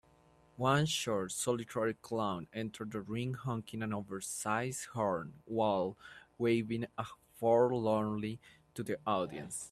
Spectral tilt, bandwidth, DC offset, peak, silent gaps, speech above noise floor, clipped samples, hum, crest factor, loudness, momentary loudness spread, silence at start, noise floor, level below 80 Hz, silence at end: -5 dB/octave; 14 kHz; under 0.1%; -16 dBFS; none; 31 dB; under 0.1%; none; 20 dB; -35 LUFS; 11 LU; 0.6 s; -66 dBFS; -70 dBFS; 0.05 s